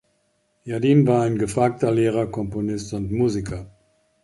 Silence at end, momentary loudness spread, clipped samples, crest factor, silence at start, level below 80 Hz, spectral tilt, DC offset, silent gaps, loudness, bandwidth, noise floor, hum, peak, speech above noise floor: 0.55 s; 13 LU; under 0.1%; 16 dB; 0.65 s; -46 dBFS; -7.5 dB/octave; under 0.1%; none; -21 LUFS; 11.5 kHz; -67 dBFS; none; -6 dBFS; 47 dB